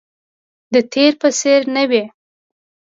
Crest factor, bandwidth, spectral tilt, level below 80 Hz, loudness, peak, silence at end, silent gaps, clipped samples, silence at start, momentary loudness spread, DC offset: 16 dB; 7.8 kHz; -2.5 dB/octave; -70 dBFS; -15 LUFS; 0 dBFS; 0.8 s; none; under 0.1%; 0.7 s; 5 LU; under 0.1%